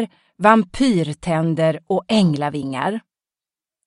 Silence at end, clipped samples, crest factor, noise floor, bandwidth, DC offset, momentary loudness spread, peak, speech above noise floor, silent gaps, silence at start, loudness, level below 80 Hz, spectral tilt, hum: 0.85 s; under 0.1%; 20 dB; under -90 dBFS; 11.5 kHz; under 0.1%; 9 LU; 0 dBFS; over 72 dB; none; 0 s; -19 LUFS; -50 dBFS; -6.5 dB/octave; none